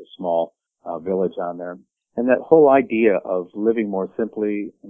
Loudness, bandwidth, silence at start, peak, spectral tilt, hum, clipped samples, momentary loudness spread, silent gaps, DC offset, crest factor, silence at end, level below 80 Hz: -20 LUFS; 3.7 kHz; 0 s; 0 dBFS; -10.5 dB/octave; none; under 0.1%; 18 LU; none; under 0.1%; 20 dB; 0 s; -62 dBFS